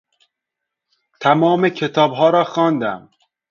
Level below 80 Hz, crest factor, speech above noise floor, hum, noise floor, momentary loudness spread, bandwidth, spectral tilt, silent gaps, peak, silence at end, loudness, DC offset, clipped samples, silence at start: -66 dBFS; 18 dB; 66 dB; none; -81 dBFS; 8 LU; 7.2 kHz; -6.5 dB/octave; none; 0 dBFS; 0.5 s; -16 LUFS; under 0.1%; under 0.1%; 1.2 s